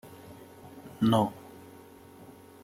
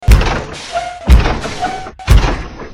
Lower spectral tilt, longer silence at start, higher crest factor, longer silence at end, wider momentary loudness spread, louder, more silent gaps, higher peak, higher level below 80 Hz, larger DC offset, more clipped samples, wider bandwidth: first, -7 dB/octave vs -5.5 dB/octave; about the same, 0.05 s vs 0 s; first, 22 dB vs 12 dB; first, 1.25 s vs 0 s; first, 26 LU vs 10 LU; second, -28 LUFS vs -15 LUFS; neither; second, -12 dBFS vs 0 dBFS; second, -68 dBFS vs -14 dBFS; neither; second, under 0.1% vs 1%; about the same, 16 kHz vs 15.5 kHz